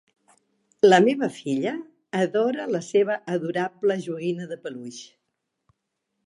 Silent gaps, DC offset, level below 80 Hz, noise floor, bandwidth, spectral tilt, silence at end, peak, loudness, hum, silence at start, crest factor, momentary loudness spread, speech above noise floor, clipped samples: none; under 0.1%; -78 dBFS; -79 dBFS; 11 kHz; -5.5 dB/octave; 1.25 s; -4 dBFS; -23 LUFS; none; 0.85 s; 22 dB; 18 LU; 56 dB; under 0.1%